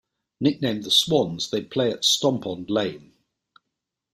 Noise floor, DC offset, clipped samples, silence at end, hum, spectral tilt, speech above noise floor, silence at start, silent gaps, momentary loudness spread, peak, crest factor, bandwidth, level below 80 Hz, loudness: -83 dBFS; under 0.1%; under 0.1%; 1.15 s; none; -4 dB/octave; 60 dB; 0.4 s; none; 9 LU; -6 dBFS; 20 dB; 15.5 kHz; -62 dBFS; -22 LUFS